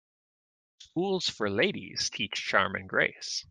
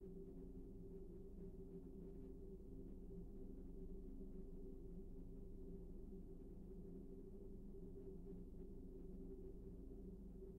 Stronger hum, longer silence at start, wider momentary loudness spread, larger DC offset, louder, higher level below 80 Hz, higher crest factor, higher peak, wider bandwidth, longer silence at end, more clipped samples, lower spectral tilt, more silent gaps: neither; first, 0.8 s vs 0 s; first, 6 LU vs 2 LU; neither; first, -29 LUFS vs -58 LUFS; second, -70 dBFS vs -58 dBFS; first, 24 dB vs 12 dB; first, -6 dBFS vs -42 dBFS; first, 10.5 kHz vs 2 kHz; about the same, 0.05 s vs 0 s; neither; second, -3 dB/octave vs -10.5 dB/octave; neither